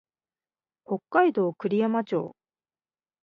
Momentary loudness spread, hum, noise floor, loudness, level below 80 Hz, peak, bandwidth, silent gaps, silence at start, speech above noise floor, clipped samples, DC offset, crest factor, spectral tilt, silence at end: 12 LU; none; under -90 dBFS; -26 LUFS; -80 dBFS; -8 dBFS; 5.4 kHz; none; 0.9 s; over 65 dB; under 0.1%; under 0.1%; 22 dB; -9 dB/octave; 0.9 s